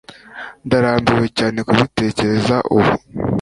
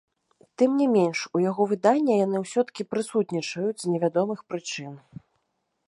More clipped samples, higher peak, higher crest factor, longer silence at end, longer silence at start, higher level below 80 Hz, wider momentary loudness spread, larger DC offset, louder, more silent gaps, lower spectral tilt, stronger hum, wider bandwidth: neither; first, 0 dBFS vs -6 dBFS; about the same, 16 dB vs 18 dB; second, 0 s vs 0.9 s; second, 0.1 s vs 0.6 s; first, -42 dBFS vs -76 dBFS; first, 16 LU vs 11 LU; neither; first, -16 LUFS vs -25 LUFS; neither; about the same, -6.5 dB/octave vs -5.5 dB/octave; neither; about the same, 11.5 kHz vs 11.5 kHz